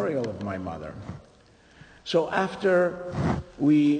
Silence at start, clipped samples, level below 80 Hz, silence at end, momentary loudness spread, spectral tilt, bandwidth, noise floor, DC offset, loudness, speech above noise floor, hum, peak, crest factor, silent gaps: 0 s; under 0.1%; -52 dBFS; 0 s; 18 LU; -7 dB/octave; 9.4 kHz; -54 dBFS; under 0.1%; -26 LUFS; 29 dB; none; -10 dBFS; 16 dB; none